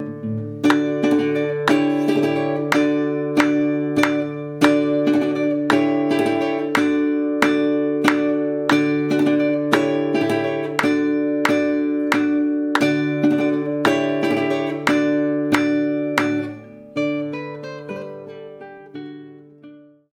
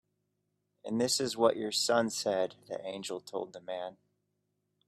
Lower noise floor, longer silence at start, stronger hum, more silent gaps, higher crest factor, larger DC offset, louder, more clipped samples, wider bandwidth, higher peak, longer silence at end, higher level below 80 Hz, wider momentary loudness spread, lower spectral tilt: second, -44 dBFS vs -81 dBFS; second, 0 s vs 0.85 s; neither; neither; about the same, 20 dB vs 22 dB; neither; first, -19 LUFS vs -32 LUFS; neither; second, 14 kHz vs 15.5 kHz; first, 0 dBFS vs -12 dBFS; second, 0.35 s vs 0.95 s; first, -64 dBFS vs -78 dBFS; about the same, 13 LU vs 12 LU; first, -6 dB/octave vs -3 dB/octave